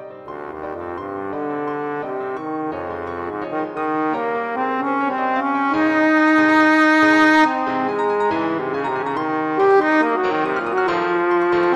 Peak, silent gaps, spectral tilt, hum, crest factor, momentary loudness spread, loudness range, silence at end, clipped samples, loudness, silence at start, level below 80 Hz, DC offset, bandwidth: -2 dBFS; none; -5.5 dB/octave; none; 16 dB; 14 LU; 10 LU; 0 s; under 0.1%; -19 LUFS; 0 s; -58 dBFS; under 0.1%; 9.8 kHz